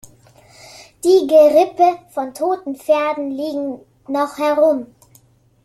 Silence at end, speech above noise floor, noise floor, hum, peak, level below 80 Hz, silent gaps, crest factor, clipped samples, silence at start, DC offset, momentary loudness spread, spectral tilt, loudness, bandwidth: 0.8 s; 37 dB; -53 dBFS; none; -2 dBFS; -62 dBFS; none; 16 dB; under 0.1%; 0.8 s; under 0.1%; 14 LU; -4 dB/octave; -16 LUFS; 14 kHz